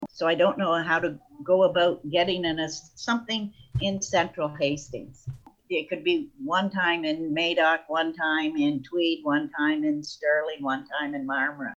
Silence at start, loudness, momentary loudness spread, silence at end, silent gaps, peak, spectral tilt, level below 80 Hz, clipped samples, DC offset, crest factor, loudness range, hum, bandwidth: 0 s; -26 LUFS; 8 LU; 0 s; none; -10 dBFS; -4.5 dB/octave; -56 dBFS; under 0.1%; under 0.1%; 16 dB; 4 LU; none; 8 kHz